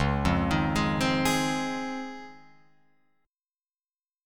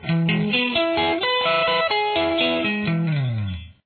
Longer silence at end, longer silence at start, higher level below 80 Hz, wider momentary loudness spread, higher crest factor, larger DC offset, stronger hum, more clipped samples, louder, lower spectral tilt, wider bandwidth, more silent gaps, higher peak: second, 0 s vs 0.15 s; about the same, 0 s vs 0 s; first, -42 dBFS vs -50 dBFS; first, 12 LU vs 5 LU; about the same, 18 dB vs 14 dB; neither; neither; neither; second, -27 LUFS vs -20 LUFS; second, -5 dB/octave vs -8.5 dB/octave; first, 19 kHz vs 4.6 kHz; first, 3.28-3.33 s vs none; about the same, -10 dBFS vs -8 dBFS